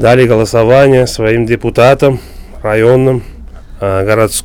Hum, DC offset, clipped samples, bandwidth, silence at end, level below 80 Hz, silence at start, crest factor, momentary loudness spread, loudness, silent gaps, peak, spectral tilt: none; under 0.1%; 2%; 18.5 kHz; 0 s; -30 dBFS; 0 s; 10 dB; 10 LU; -9 LUFS; none; 0 dBFS; -6 dB/octave